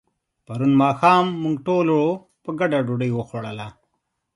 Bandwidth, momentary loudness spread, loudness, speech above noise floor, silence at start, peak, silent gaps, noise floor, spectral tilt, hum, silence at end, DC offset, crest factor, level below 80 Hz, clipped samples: 11 kHz; 16 LU; -20 LUFS; 55 dB; 0.5 s; -2 dBFS; none; -74 dBFS; -7.5 dB/octave; none; 0.65 s; under 0.1%; 18 dB; -62 dBFS; under 0.1%